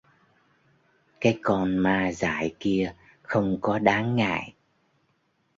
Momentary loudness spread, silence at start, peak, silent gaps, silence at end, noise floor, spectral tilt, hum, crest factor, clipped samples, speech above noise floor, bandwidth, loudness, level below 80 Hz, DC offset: 6 LU; 1.2 s; -4 dBFS; none; 1.1 s; -70 dBFS; -6.5 dB/octave; none; 22 dB; under 0.1%; 46 dB; 7.8 kHz; -25 LUFS; -54 dBFS; under 0.1%